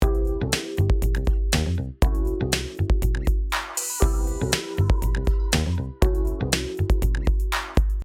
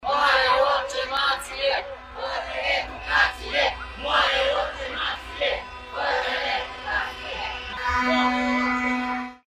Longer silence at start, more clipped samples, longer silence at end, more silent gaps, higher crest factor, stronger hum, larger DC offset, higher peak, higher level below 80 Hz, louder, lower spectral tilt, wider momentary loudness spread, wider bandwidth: about the same, 0 s vs 0 s; neither; second, 0 s vs 0.15 s; neither; about the same, 18 dB vs 18 dB; neither; neither; about the same, -4 dBFS vs -6 dBFS; first, -24 dBFS vs -44 dBFS; about the same, -24 LUFS vs -24 LUFS; first, -4.5 dB/octave vs -3 dB/octave; second, 3 LU vs 11 LU; about the same, 16.5 kHz vs 15.5 kHz